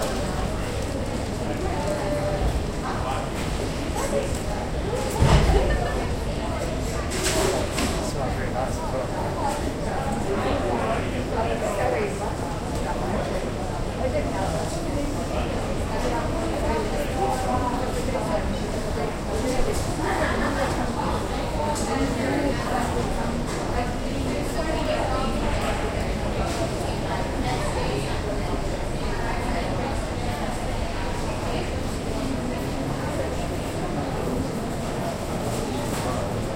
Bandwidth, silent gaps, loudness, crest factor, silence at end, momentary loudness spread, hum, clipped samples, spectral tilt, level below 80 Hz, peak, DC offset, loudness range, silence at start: 16 kHz; none; -26 LUFS; 22 dB; 0 s; 4 LU; none; under 0.1%; -5.5 dB/octave; -30 dBFS; -4 dBFS; under 0.1%; 4 LU; 0 s